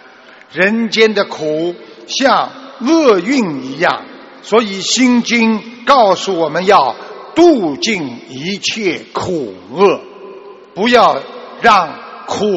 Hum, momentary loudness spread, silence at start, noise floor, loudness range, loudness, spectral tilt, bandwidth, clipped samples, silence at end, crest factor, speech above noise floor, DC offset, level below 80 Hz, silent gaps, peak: none; 15 LU; 0.55 s; -40 dBFS; 3 LU; -13 LUFS; -4 dB/octave; 8.2 kHz; 0.1%; 0 s; 14 dB; 27 dB; under 0.1%; -54 dBFS; none; 0 dBFS